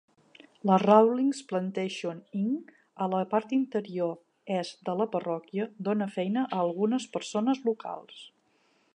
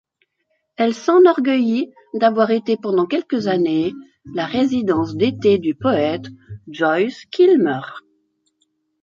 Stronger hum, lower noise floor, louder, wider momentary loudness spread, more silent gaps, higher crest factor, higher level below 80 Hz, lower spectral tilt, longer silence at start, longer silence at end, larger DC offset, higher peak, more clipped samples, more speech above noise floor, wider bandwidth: neither; about the same, -68 dBFS vs -70 dBFS; second, -29 LUFS vs -18 LUFS; second, 11 LU vs 14 LU; neither; first, 22 dB vs 16 dB; second, -84 dBFS vs -56 dBFS; about the same, -6.5 dB/octave vs -6.5 dB/octave; second, 0.65 s vs 0.8 s; second, 0.7 s vs 1.05 s; neither; second, -8 dBFS vs -2 dBFS; neither; second, 40 dB vs 53 dB; first, 10 kHz vs 7.4 kHz